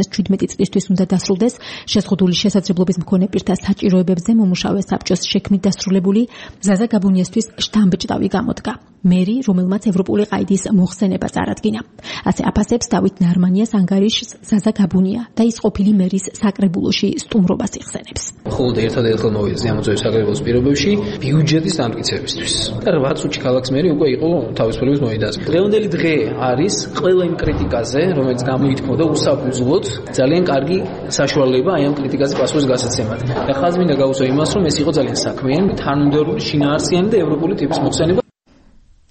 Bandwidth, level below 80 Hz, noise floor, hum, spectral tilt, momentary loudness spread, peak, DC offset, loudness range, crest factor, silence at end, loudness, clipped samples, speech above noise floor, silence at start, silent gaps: 8.8 kHz; -40 dBFS; -50 dBFS; none; -5.5 dB/octave; 5 LU; -4 dBFS; under 0.1%; 1 LU; 12 dB; 0.9 s; -16 LUFS; under 0.1%; 34 dB; 0 s; none